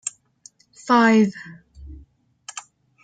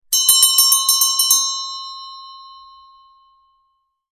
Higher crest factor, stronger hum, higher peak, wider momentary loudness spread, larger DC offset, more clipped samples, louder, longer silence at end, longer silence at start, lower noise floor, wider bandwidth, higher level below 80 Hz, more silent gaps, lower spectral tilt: about the same, 18 dB vs 18 dB; neither; second, -6 dBFS vs 0 dBFS; first, 26 LU vs 21 LU; neither; neither; second, -18 LUFS vs -12 LUFS; second, 0.45 s vs 1.6 s; about the same, 0.05 s vs 0.1 s; second, -53 dBFS vs -67 dBFS; second, 9.2 kHz vs 16 kHz; first, -50 dBFS vs -66 dBFS; neither; first, -4.5 dB/octave vs 5 dB/octave